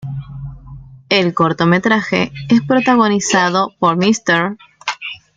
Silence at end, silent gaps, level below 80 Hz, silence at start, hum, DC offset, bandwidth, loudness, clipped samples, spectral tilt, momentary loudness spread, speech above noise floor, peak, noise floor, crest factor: 0.2 s; none; -46 dBFS; 0 s; none; under 0.1%; 9.4 kHz; -14 LUFS; under 0.1%; -4.5 dB/octave; 14 LU; 22 dB; -2 dBFS; -36 dBFS; 14 dB